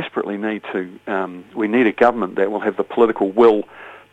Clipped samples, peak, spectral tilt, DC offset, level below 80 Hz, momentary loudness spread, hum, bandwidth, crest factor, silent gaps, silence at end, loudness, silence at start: under 0.1%; 0 dBFS; -7.5 dB/octave; under 0.1%; -60 dBFS; 12 LU; none; 8 kHz; 18 dB; none; 0.15 s; -19 LUFS; 0 s